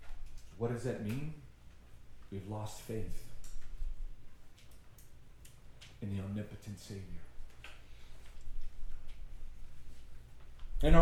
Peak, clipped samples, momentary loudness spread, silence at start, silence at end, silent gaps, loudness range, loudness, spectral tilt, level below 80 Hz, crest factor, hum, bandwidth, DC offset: -10 dBFS; under 0.1%; 21 LU; 0 s; 0 s; none; 11 LU; -43 LUFS; -6.5 dB/octave; -42 dBFS; 26 dB; none; 13 kHz; under 0.1%